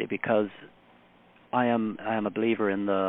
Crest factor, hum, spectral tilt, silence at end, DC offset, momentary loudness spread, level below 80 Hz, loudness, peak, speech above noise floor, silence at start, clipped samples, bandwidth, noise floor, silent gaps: 16 dB; none; -10 dB/octave; 0 s; under 0.1%; 4 LU; -70 dBFS; -28 LUFS; -12 dBFS; 31 dB; 0 s; under 0.1%; 3.9 kHz; -58 dBFS; none